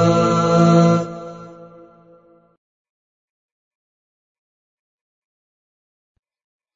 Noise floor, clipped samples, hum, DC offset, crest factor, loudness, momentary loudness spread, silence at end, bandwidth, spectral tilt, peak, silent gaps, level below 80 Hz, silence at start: -51 dBFS; under 0.1%; none; under 0.1%; 20 dB; -15 LUFS; 22 LU; 5.1 s; 7.6 kHz; -7 dB/octave; -2 dBFS; none; -56 dBFS; 0 s